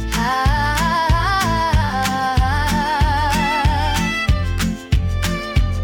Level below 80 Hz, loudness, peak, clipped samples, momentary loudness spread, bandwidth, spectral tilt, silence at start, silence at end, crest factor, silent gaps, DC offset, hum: -22 dBFS; -18 LUFS; -6 dBFS; under 0.1%; 3 LU; 18 kHz; -5 dB/octave; 0 s; 0 s; 12 dB; none; under 0.1%; none